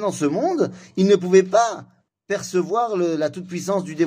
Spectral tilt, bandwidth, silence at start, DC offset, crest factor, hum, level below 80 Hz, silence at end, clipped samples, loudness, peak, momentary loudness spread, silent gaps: -5.5 dB/octave; 15.5 kHz; 0 s; under 0.1%; 16 dB; none; -68 dBFS; 0 s; under 0.1%; -21 LUFS; -4 dBFS; 11 LU; none